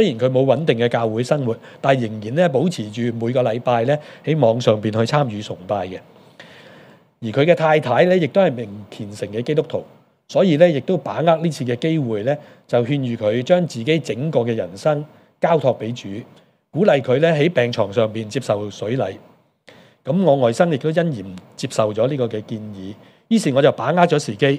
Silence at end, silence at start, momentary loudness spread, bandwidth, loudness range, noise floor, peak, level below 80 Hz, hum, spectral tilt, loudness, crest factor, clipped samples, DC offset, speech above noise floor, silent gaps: 0 s; 0 s; 14 LU; 12.5 kHz; 2 LU; -49 dBFS; 0 dBFS; -68 dBFS; none; -6.5 dB/octave; -19 LUFS; 18 dB; under 0.1%; under 0.1%; 31 dB; none